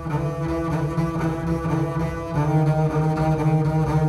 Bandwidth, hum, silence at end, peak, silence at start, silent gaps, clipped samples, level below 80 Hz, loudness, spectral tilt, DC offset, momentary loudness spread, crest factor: 12 kHz; none; 0 s; -10 dBFS; 0 s; none; under 0.1%; -38 dBFS; -23 LUFS; -8.5 dB/octave; under 0.1%; 5 LU; 12 dB